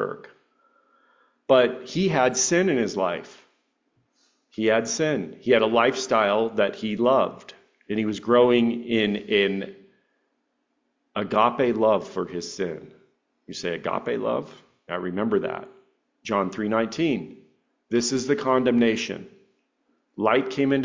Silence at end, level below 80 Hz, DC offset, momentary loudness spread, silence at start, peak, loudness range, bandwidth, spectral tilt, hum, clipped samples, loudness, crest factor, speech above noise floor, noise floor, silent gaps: 0 s; -64 dBFS; under 0.1%; 13 LU; 0 s; -6 dBFS; 6 LU; 7.6 kHz; -4.5 dB/octave; none; under 0.1%; -23 LUFS; 20 dB; 51 dB; -74 dBFS; none